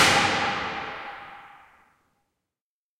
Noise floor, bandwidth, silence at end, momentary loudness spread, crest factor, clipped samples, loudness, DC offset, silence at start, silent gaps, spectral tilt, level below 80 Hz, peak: under -90 dBFS; 16.5 kHz; 1.5 s; 23 LU; 22 dB; under 0.1%; -24 LUFS; under 0.1%; 0 s; none; -2 dB/octave; -58 dBFS; -6 dBFS